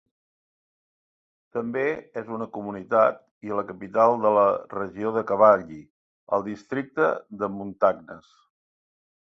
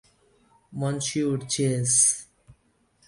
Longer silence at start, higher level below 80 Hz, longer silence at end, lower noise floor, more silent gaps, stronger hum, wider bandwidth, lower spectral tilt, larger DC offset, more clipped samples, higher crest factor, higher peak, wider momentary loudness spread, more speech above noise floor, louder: first, 1.55 s vs 0.7 s; about the same, -66 dBFS vs -62 dBFS; first, 1.1 s vs 0.55 s; first, under -90 dBFS vs -66 dBFS; first, 3.31-3.41 s, 5.90-6.27 s vs none; neither; second, 6.4 kHz vs 11.5 kHz; first, -8 dB/octave vs -3.5 dB/octave; neither; neither; about the same, 22 dB vs 20 dB; about the same, -4 dBFS vs -6 dBFS; about the same, 15 LU vs 13 LU; first, over 66 dB vs 41 dB; about the same, -24 LUFS vs -23 LUFS